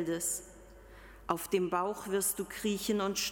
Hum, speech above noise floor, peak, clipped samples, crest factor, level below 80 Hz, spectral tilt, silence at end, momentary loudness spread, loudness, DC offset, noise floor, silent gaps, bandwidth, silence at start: none; 20 dB; -14 dBFS; under 0.1%; 20 dB; -60 dBFS; -3 dB/octave; 0 s; 18 LU; -33 LUFS; under 0.1%; -53 dBFS; none; 17.5 kHz; 0 s